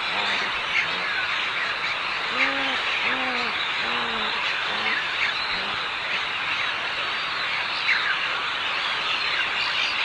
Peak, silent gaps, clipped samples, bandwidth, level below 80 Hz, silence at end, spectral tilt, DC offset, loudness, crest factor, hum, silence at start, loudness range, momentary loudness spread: -8 dBFS; none; under 0.1%; 11 kHz; -60 dBFS; 0 s; -1.5 dB/octave; under 0.1%; -23 LUFS; 16 dB; none; 0 s; 1 LU; 3 LU